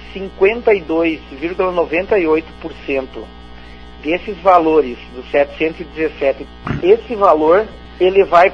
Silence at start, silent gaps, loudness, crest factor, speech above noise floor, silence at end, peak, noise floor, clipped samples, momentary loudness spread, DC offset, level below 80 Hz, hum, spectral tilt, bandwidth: 0 s; none; -15 LUFS; 16 dB; 20 dB; 0 s; 0 dBFS; -35 dBFS; under 0.1%; 16 LU; under 0.1%; -38 dBFS; 60 Hz at -40 dBFS; -7 dB/octave; 7 kHz